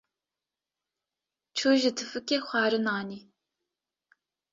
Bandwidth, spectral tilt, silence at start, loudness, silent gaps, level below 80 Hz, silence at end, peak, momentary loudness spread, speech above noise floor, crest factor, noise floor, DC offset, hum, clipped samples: 7.8 kHz; -3.5 dB/octave; 1.55 s; -27 LUFS; none; -76 dBFS; 1.35 s; -12 dBFS; 12 LU; over 63 dB; 20 dB; under -90 dBFS; under 0.1%; none; under 0.1%